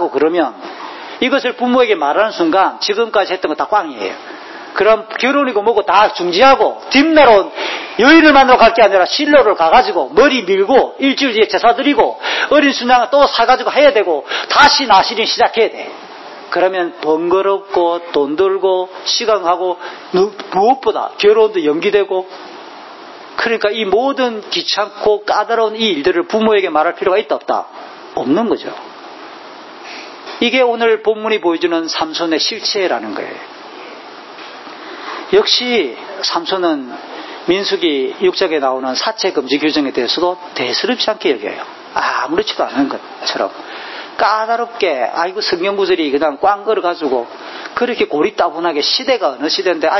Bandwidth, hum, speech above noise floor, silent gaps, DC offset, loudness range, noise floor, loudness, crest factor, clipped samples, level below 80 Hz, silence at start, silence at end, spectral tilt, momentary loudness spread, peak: 6.6 kHz; none; 20 dB; none; under 0.1%; 8 LU; -33 dBFS; -13 LUFS; 14 dB; under 0.1%; -50 dBFS; 0 s; 0 s; -3.5 dB/octave; 18 LU; 0 dBFS